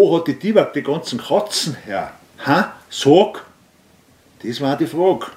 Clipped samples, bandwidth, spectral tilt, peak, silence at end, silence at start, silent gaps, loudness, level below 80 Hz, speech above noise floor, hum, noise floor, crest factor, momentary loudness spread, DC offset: under 0.1%; 16 kHz; -5 dB/octave; 0 dBFS; 0.05 s; 0 s; none; -18 LUFS; -62 dBFS; 35 dB; none; -53 dBFS; 18 dB; 13 LU; under 0.1%